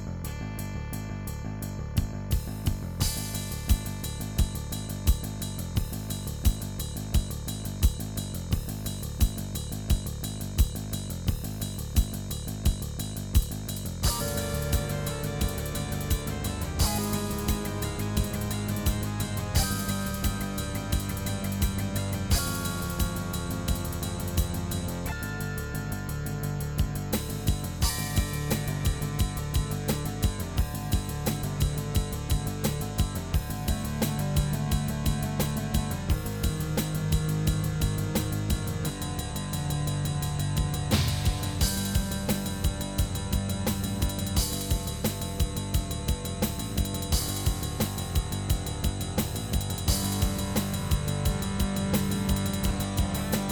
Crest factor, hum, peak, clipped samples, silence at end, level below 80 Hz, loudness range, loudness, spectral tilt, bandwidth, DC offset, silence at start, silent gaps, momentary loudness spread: 18 dB; none; -10 dBFS; under 0.1%; 0 s; -34 dBFS; 3 LU; -30 LUFS; -5 dB/octave; 19 kHz; under 0.1%; 0 s; none; 6 LU